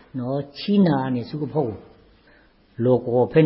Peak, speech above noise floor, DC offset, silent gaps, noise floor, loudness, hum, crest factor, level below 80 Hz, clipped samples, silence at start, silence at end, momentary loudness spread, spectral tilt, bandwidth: -4 dBFS; 34 dB; under 0.1%; none; -55 dBFS; -22 LUFS; none; 18 dB; -56 dBFS; under 0.1%; 0.15 s; 0 s; 10 LU; -12.5 dB/octave; 5.8 kHz